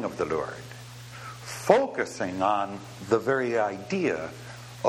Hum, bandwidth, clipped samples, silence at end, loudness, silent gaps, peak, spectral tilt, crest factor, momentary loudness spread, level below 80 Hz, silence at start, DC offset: none; 16.5 kHz; under 0.1%; 0 s; -27 LUFS; none; -2 dBFS; -5 dB/octave; 26 dB; 19 LU; -62 dBFS; 0 s; under 0.1%